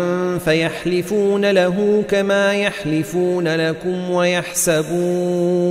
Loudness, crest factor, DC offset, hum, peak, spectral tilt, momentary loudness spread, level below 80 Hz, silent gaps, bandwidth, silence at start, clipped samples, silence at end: -18 LUFS; 16 dB; under 0.1%; none; -2 dBFS; -5 dB/octave; 4 LU; -52 dBFS; none; 16 kHz; 0 s; under 0.1%; 0 s